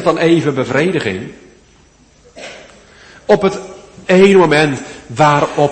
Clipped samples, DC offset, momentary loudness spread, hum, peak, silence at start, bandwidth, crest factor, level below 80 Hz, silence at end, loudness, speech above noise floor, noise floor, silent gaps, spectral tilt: under 0.1%; under 0.1%; 24 LU; none; 0 dBFS; 0 s; 8.8 kHz; 14 dB; -48 dBFS; 0 s; -12 LUFS; 36 dB; -48 dBFS; none; -6 dB/octave